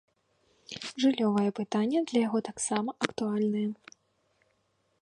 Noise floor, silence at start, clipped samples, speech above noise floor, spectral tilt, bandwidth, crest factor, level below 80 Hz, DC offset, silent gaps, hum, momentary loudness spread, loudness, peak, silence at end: -73 dBFS; 0.7 s; under 0.1%; 45 dB; -4.5 dB/octave; 11 kHz; 24 dB; -74 dBFS; under 0.1%; none; none; 11 LU; -29 LUFS; -8 dBFS; 1.3 s